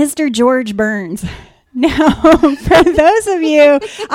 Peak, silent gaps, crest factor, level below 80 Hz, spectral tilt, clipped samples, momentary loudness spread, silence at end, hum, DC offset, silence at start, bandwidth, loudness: 0 dBFS; none; 12 dB; -32 dBFS; -5 dB/octave; under 0.1%; 13 LU; 0 s; none; under 0.1%; 0 s; 16 kHz; -11 LUFS